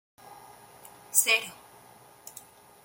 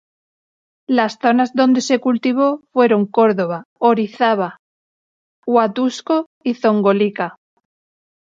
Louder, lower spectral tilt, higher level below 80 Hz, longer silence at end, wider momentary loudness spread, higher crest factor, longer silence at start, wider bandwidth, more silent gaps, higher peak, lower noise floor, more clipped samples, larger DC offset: second, -24 LUFS vs -17 LUFS; second, 2 dB/octave vs -5.5 dB/octave; second, -78 dBFS vs -70 dBFS; second, 0.55 s vs 1.05 s; first, 28 LU vs 6 LU; first, 28 dB vs 16 dB; second, 0.25 s vs 0.9 s; first, 17 kHz vs 7.6 kHz; second, none vs 3.65-3.76 s, 4.59-5.43 s, 6.26-6.41 s; second, -6 dBFS vs -2 dBFS; second, -54 dBFS vs under -90 dBFS; neither; neither